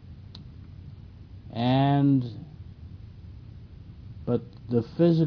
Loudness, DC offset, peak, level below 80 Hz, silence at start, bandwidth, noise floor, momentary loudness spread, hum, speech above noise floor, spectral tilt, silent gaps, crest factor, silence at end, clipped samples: -26 LUFS; under 0.1%; -10 dBFS; -50 dBFS; 0.05 s; 5.4 kHz; -45 dBFS; 24 LU; none; 21 dB; -10 dB/octave; none; 18 dB; 0 s; under 0.1%